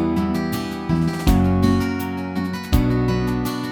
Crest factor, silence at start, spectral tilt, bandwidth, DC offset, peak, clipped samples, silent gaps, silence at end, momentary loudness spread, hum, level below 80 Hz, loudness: 16 dB; 0 s; -7 dB/octave; 19.5 kHz; under 0.1%; -2 dBFS; under 0.1%; none; 0 s; 8 LU; none; -28 dBFS; -21 LUFS